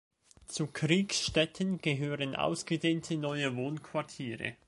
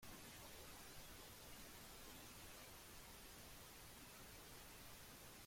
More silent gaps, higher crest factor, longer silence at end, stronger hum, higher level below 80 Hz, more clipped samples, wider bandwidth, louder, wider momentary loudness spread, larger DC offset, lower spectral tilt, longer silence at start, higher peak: neither; first, 20 dB vs 14 dB; first, 0.15 s vs 0 s; neither; first, -62 dBFS vs -68 dBFS; neither; second, 11.5 kHz vs 16.5 kHz; first, -33 LUFS vs -58 LUFS; first, 9 LU vs 1 LU; neither; first, -4.5 dB/octave vs -2.5 dB/octave; first, 0.5 s vs 0 s; first, -12 dBFS vs -44 dBFS